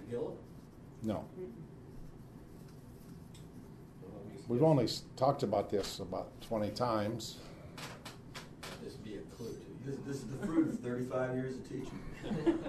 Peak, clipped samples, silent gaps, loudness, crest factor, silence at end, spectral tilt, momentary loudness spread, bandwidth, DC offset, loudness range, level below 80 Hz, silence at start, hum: -16 dBFS; under 0.1%; none; -37 LUFS; 22 dB; 0 s; -6.5 dB/octave; 20 LU; 13.5 kHz; under 0.1%; 13 LU; -58 dBFS; 0 s; none